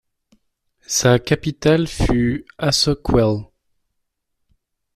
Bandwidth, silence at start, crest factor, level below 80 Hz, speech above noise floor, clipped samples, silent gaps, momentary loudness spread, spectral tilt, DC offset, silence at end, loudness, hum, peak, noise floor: 14.5 kHz; 0.9 s; 18 dB; -34 dBFS; 56 dB; under 0.1%; none; 6 LU; -4.5 dB/octave; under 0.1%; 1.5 s; -18 LUFS; none; -2 dBFS; -74 dBFS